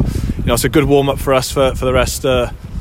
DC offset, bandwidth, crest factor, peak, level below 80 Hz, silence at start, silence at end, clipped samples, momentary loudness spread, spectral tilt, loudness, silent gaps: under 0.1%; 16.5 kHz; 14 dB; 0 dBFS; -24 dBFS; 0 s; 0 s; under 0.1%; 6 LU; -5 dB/octave; -15 LUFS; none